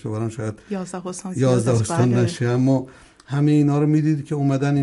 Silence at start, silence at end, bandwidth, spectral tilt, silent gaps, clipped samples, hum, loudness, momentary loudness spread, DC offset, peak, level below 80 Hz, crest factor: 0.05 s; 0 s; 11.5 kHz; -7.5 dB/octave; none; under 0.1%; none; -21 LUFS; 12 LU; under 0.1%; -6 dBFS; -56 dBFS; 14 dB